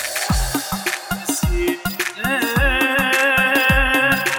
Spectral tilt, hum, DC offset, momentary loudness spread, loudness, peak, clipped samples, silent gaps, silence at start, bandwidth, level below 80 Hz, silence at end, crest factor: -3.5 dB/octave; none; under 0.1%; 8 LU; -17 LUFS; -2 dBFS; under 0.1%; none; 0 s; over 20 kHz; -28 dBFS; 0 s; 16 dB